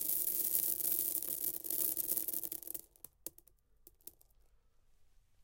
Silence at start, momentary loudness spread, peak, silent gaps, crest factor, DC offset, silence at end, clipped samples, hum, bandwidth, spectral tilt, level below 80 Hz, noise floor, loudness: 0 s; 21 LU; -12 dBFS; none; 28 dB; under 0.1%; 0.4 s; under 0.1%; none; 17 kHz; -0.5 dB/octave; -72 dBFS; -68 dBFS; -34 LUFS